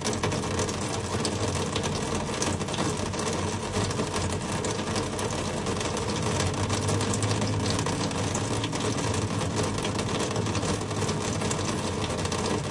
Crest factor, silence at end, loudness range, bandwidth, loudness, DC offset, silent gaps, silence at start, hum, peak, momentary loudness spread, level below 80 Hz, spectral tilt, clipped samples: 16 dB; 0 s; 1 LU; 11.5 kHz; -28 LUFS; under 0.1%; none; 0 s; none; -12 dBFS; 2 LU; -46 dBFS; -4.5 dB/octave; under 0.1%